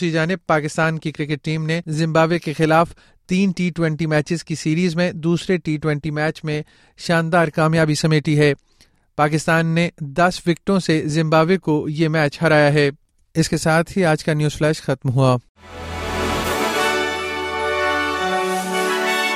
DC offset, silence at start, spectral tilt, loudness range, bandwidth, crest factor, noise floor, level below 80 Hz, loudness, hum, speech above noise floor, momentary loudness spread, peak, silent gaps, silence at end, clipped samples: under 0.1%; 0 s; -5.5 dB/octave; 3 LU; 15.5 kHz; 16 dB; -53 dBFS; -46 dBFS; -19 LUFS; none; 35 dB; 7 LU; -2 dBFS; 15.49-15.55 s; 0 s; under 0.1%